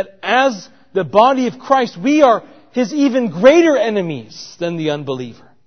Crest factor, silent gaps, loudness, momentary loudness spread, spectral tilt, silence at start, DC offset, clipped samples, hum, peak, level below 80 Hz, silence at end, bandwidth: 16 dB; none; -15 LUFS; 14 LU; -5.5 dB/octave; 0 s; 0.3%; under 0.1%; none; 0 dBFS; -58 dBFS; 0.35 s; 6.6 kHz